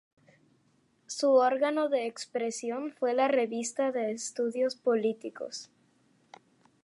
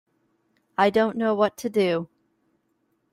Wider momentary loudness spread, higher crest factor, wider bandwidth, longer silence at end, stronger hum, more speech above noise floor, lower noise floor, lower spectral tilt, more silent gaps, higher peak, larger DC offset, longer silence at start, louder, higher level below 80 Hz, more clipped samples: first, 14 LU vs 10 LU; about the same, 18 dB vs 20 dB; second, 11.5 kHz vs 16 kHz; about the same, 1.2 s vs 1.1 s; neither; second, 40 dB vs 49 dB; about the same, -69 dBFS vs -71 dBFS; second, -3 dB/octave vs -5.5 dB/octave; neither; second, -12 dBFS vs -6 dBFS; neither; first, 1.1 s vs 0.8 s; second, -30 LUFS vs -23 LUFS; second, -88 dBFS vs -68 dBFS; neither